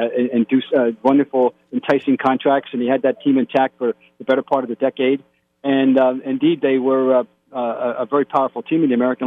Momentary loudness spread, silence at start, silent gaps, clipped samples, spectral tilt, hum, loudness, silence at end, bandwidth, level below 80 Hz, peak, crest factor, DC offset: 7 LU; 0 s; none; under 0.1%; -8 dB/octave; none; -18 LUFS; 0 s; 4.9 kHz; -70 dBFS; -4 dBFS; 14 dB; under 0.1%